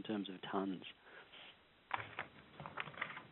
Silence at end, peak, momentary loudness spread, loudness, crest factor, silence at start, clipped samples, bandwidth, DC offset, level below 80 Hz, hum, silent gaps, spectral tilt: 0 s; -22 dBFS; 15 LU; -46 LUFS; 26 dB; 0 s; under 0.1%; 4 kHz; under 0.1%; -82 dBFS; none; none; -3 dB/octave